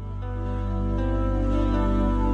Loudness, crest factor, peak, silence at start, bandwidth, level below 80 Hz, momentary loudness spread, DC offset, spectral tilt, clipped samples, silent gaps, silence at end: -26 LUFS; 12 dB; -12 dBFS; 0 s; 6.2 kHz; -26 dBFS; 7 LU; under 0.1%; -9 dB/octave; under 0.1%; none; 0 s